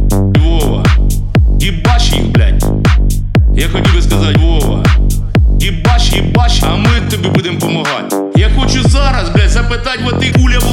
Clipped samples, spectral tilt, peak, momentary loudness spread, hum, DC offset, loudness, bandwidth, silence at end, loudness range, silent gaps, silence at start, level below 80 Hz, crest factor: under 0.1%; -5.5 dB/octave; 0 dBFS; 3 LU; none; under 0.1%; -11 LUFS; 16.5 kHz; 0 s; 1 LU; none; 0 s; -12 dBFS; 8 dB